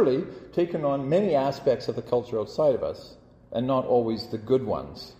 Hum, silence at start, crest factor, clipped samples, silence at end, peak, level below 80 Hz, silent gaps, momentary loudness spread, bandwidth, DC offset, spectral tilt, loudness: none; 0 s; 16 dB; under 0.1%; 0.05 s; -10 dBFS; -56 dBFS; none; 9 LU; 14.5 kHz; under 0.1%; -7.5 dB/octave; -26 LUFS